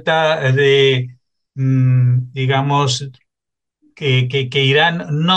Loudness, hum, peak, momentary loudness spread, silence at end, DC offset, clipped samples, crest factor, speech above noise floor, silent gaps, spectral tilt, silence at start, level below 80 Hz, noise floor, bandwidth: -15 LUFS; none; -2 dBFS; 10 LU; 0 s; under 0.1%; under 0.1%; 14 dB; 69 dB; none; -5.5 dB/octave; 0.05 s; -60 dBFS; -84 dBFS; 8.6 kHz